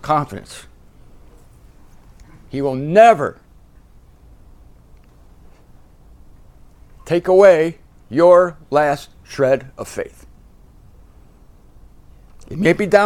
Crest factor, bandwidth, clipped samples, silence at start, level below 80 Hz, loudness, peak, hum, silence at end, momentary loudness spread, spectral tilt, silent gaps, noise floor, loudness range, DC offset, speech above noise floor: 18 dB; 14 kHz; under 0.1%; 0.05 s; -46 dBFS; -15 LUFS; 0 dBFS; none; 0 s; 21 LU; -6 dB/octave; none; -46 dBFS; 11 LU; under 0.1%; 32 dB